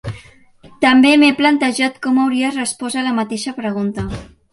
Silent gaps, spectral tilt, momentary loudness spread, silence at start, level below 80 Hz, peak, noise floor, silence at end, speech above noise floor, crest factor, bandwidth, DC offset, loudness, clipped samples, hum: none; -4 dB/octave; 16 LU; 0.05 s; -44 dBFS; -2 dBFS; -45 dBFS; 0.25 s; 30 dB; 16 dB; 11.5 kHz; under 0.1%; -15 LUFS; under 0.1%; none